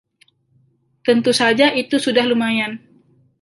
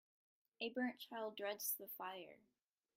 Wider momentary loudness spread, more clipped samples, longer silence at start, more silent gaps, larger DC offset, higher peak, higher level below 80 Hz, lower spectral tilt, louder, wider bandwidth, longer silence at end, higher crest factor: about the same, 10 LU vs 8 LU; neither; first, 1.05 s vs 0.6 s; neither; neither; first, -2 dBFS vs -28 dBFS; first, -66 dBFS vs under -90 dBFS; first, -3.5 dB/octave vs -1.5 dB/octave; first, -17 LUFS vs -46 LUFS; second, 11.5 kHz vs 16.5 kHz; about the same, 0.65 s vs 0.6 s; about the same, 18 dB vs 22 dB